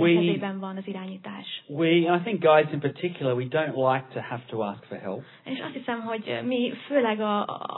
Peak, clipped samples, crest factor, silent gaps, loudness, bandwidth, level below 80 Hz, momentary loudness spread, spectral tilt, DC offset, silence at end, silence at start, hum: -6 dBFS; under 0.1%; 20 dB; none; -26 LUFS; 4.2 kHz; -82 dBFS; 15 LU; -10 dB/octave; under 0.1%; 0 s; 0 s; none